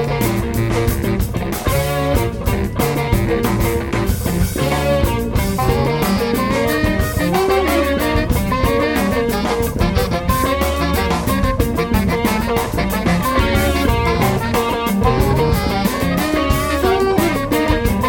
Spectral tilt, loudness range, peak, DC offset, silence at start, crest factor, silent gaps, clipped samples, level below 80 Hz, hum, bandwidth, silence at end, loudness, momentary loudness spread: -5.5 dB/octave; 2 LU; 0 dBFS; under 0.1%; 0 s; 16 dB; none; under 0.1%; -24 dBFS; none; 17.5 kHz; 0 s; -17 LUFS; 3 LU